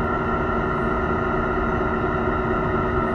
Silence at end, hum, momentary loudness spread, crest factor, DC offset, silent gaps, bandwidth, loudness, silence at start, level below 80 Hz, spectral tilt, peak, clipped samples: 0 s; none; 1 LU; 12 dB; under 0.1%; none; 7 kHz; -22 LUFS; 0 s; -32 dBFS; -8.5 dB/octave; -10 dBFS; under 0.1%